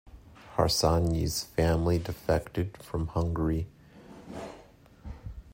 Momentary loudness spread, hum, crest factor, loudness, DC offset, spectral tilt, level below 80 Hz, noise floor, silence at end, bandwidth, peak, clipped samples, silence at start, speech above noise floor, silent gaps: 20 LU; none; 20 dB; -29 LUFS; under 0.1%; -5.5 dB/octave; -44 dBFS; -54 dBFS; 0 s; 16 kHz; -10 dBFS; under 0.1%; 0.05 s; 27 dB; none